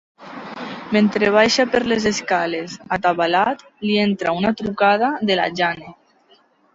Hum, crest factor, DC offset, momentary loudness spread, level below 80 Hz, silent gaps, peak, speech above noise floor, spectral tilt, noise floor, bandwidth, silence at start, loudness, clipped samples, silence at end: none; 18 dB; under 0.1%; 16 LU; -56 dBFS; none; -2 dBFS; 37 dB; -4.5 dB/octave; -56 dBFS; 7.8 kHz; 0.2 s; -18 LUFS; under 0.1%; 0.85 s